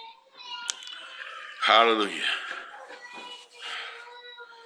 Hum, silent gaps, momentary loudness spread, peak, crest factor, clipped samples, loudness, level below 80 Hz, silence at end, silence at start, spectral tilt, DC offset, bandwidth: none; none; 24 LU; -2 dBFS; 26 dB; under 0.1%; -25 LUFS; under -90 dBFS; 0 s; 0 s; -1 dB/octave; under 0.1%; 15 kHz